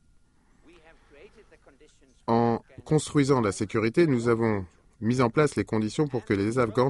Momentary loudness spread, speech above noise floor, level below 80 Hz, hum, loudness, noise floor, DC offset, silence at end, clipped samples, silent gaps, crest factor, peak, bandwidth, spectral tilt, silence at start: 8 LU; 35 dB; -56 dBFS; none; -26 LUFS; -61 dBFS; under 0.1%; 0 s; under 0.1%; none; 18 dB; -10 dBFS; 11.5 kHz; -6.5 dB/octave; 2.3 s